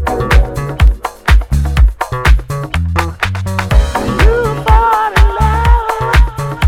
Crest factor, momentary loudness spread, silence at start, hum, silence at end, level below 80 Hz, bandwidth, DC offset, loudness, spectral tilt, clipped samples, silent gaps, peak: 10 dB; 6 LU; 0 s; none; 0 s; -12 dBFS; 14.5 kHz; under 0.1%; -13 LUFS; -6 dB/octave; 0.4%; none; 0 dBFS